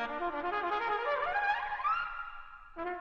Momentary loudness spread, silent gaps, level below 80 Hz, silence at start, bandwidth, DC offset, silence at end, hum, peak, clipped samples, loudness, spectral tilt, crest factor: 12 LU; none; -58 dBFS; 0 s; 7.4 kHz; under 0.1%; 0 s; none; -18 dBFS; under 0.1%; -33 LUFS; -4.5 dB/octave; 16 dB